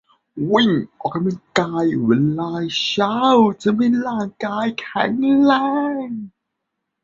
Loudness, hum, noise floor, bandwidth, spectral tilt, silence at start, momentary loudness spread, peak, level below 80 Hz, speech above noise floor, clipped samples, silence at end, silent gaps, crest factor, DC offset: -18 LUFS; none; -78 dBFS; 7.8 kHz; -6 dB/octave; 0.35 s; 11 LU; 0 dBFS; -60 dBFS; 60 dB; under 0.1%; 0.75 s; none; 18 dB; under 0.1%